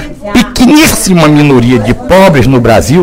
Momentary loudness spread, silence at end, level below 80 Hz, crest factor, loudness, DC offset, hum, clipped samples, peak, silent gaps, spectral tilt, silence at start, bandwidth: 6 LU; 0 s; -22 dBFS; 6 dB; -5 LUFS; under 0.1%; none; 6%; 0 dBFS; none; -5.5 dB/octave; 0 s; 19.5 kHz